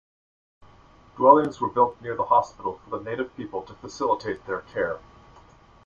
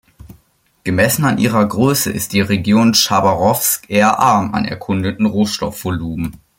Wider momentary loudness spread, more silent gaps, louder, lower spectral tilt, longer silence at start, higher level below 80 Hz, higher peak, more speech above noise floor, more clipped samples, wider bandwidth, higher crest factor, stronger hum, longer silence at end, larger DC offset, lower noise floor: first, 17 LU vs 10 LU; neither; second, -24 LUFS vs -15 LUFS; first, -6.5 dB/octave vs -4.5 dB/octave; first, 1.15 s vs 0.25 s; second, -58 dBFS vs -46 dBFS; about the same, -2 dBFS vs 0 dBFS; second, 29 dB vs 41 dB; neither; second, 7.4 kHz vs 17 kHz; first, 24 dB vs 14 dB; neither; first, 0.85 s vs 0.25 s; neither; about the same, -53 dBFS vs -56 dBFS